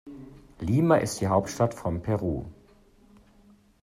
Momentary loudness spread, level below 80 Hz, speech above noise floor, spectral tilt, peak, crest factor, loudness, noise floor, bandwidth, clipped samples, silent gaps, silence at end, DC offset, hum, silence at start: 20 LU; -52 dBFS; 31 dB; -6.5 dB/octave; -8 dBFS; 20 dB; -26 LUFS; -58 dBFS; 15.5 kHz; under 0.1%; none; 1.3 s; under 0.1%; none; 0.05 s